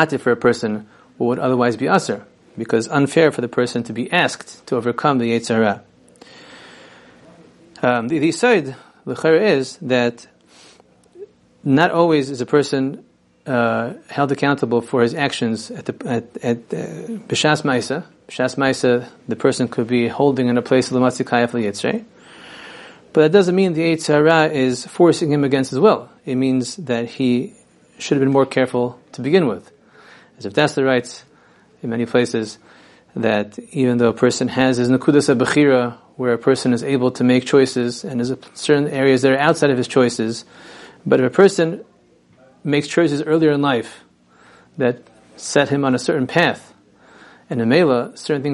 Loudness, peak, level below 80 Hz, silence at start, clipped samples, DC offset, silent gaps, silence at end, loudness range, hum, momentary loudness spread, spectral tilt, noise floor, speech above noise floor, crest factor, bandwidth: -18 LUFS; 0 dBFS; -62 dBFS; 0 s; under 0.1%; under 0.1%; none; 0 s; 5 LU; none; 13 LU; -5.5 dB/octave; -53 dBFS; 36 dB; 18 dB; 11.5 kHz